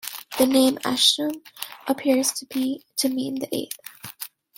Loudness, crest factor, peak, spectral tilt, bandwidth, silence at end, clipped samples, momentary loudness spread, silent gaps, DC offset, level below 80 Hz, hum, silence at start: -22 LUFS; 20 dB; -4 dBFS; -2 dB/octave; 17 kHz; 0.3 s; under 0.1%; 18 LU; none; under 0.1%; -66 dBFS; none; 0.05 s